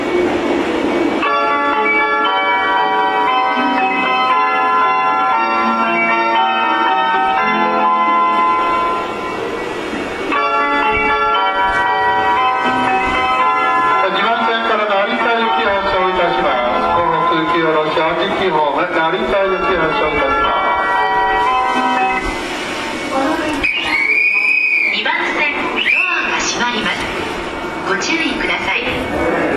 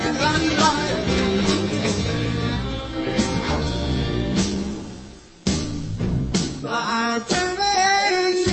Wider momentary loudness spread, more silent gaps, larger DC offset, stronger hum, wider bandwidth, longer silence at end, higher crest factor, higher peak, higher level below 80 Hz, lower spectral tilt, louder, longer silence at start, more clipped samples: second, 5 LU vs 9 LU; neither; neither; neither; first, 13.5 kHz vs 8.8 kHz; about the same, 0 s vs 0 s; second, 12 dB vs 18 dB; about the same, -4 dBFS vs -4 dBFS; second, -42 dBFS vs -36 dBFS; about the same, -3.5 dB/octave vs -4.5 dB/octave; first, -14 LUFS vs -22 LUFS; about the same, 0 s vs 0 s; neither